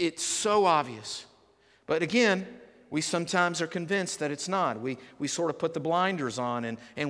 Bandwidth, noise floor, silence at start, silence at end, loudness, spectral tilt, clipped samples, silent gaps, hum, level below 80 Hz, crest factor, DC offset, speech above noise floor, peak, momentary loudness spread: 11 kHz; -63 dBFS; 0 s; 0 s; -28 LUFS; -3.5 dB/octave; under 0.1%; none; none; -72 dBFS; 18 dB; under 0.1%; 34 dB; -10 dBFS; 12 LU